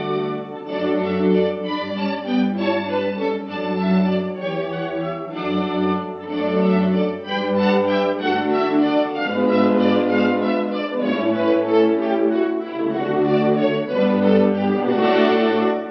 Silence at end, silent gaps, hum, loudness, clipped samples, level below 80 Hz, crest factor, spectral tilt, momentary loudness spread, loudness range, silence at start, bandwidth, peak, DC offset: 0 s; none; none; -20 LUFS; under 0.1%; -66 dBFS; 16 dB; -8.5 dB/octave; 8 LU; 4 LU; 0 s; 6 kHz; -2 dBFS; under 0.1%